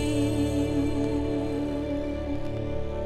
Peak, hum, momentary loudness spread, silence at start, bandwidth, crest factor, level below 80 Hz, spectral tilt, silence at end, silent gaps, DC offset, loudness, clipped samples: -14 dBFS; none; 6 LU; 0 s; 13 kHz; 12 dB; -38 dBFS; -7 dB/octave; 0 s; none; under 0.1%; -28 LUFS; under 0.1%